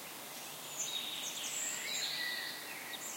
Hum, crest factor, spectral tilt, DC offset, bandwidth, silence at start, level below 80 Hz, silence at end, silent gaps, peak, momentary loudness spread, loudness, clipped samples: none; 16 dB; 1 dB/octave; under 0.1%; 16.5 kHz; 0 s; -84 dBFS; 0 s; none; -24 dBFS; 8 LU; -38 LUFS; under 0.1%